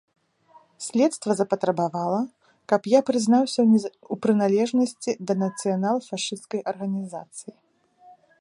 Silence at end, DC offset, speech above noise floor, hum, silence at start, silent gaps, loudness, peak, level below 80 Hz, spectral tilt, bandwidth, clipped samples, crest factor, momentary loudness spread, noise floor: 1 s; under 0.1%; 33 dB; none; 0.8 s; none; -24 LUFS; -4 dBFS; -74 dBFS; -5.5 dB/octave; 11.5 kHz; under 0.1%; 20 dB; 12 LU; -57 dBFS